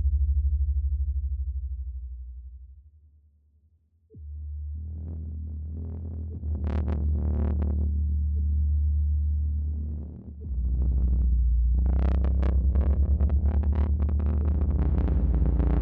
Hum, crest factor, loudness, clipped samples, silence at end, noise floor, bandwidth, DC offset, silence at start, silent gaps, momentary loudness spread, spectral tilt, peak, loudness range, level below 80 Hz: none; 14 dB; -28 LUFS; under 0.1%; 0 s; -64 dBFS; 2.4 kHz; under 0.1%; 0 s; none; 12 LU; -11 dB/octave; -12 dBFS; 15 LU; -26 dBFS